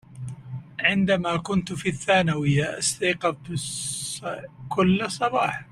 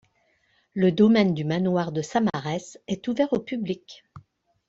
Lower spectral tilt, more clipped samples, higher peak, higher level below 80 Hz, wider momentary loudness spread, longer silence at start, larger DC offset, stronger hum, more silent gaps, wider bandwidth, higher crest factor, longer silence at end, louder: second, -4.5 dB/octave vs -7 dB/octave; neither; about the same, -6 dBFS vs -8 dBFS; first, -56 dBFS vs -62 dBFS; about the same, 14 LU vs 14 LU; second, 0.1 s vs 0.75 s; neither; neither; neither; first, 13 kHz vs 7.8 kHz; about the same, 20 dB vs 18 dB; second, 0.1 s vs 0.5 s; about the same, -24 LUFS vs -24 LUFS